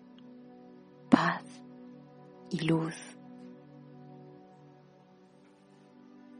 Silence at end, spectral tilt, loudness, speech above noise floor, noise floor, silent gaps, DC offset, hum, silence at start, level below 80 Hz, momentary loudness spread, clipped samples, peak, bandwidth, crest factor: 2.1 s; -6.5 dB/octave; -30 LUFS; 27 dB; -59 dBFS; none; under 0.1%; none; 0.25 s; -74 dBFS; 28 LU; under 0.1%; -4 dBFS; 10 kHz; 32 dB